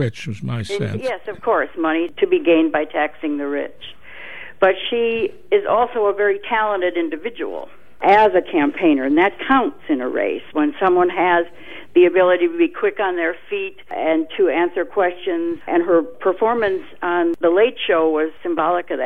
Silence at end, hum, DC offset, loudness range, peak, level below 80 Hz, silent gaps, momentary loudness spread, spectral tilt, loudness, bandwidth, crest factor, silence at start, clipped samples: 0 s; none; 1%; 3 LU; -2 dBFS; -54 dBFS; none; 11 LU; -7 dB/octave; -18 LUFS; 9 kHz; 16 dB; 0 s; under 0.1%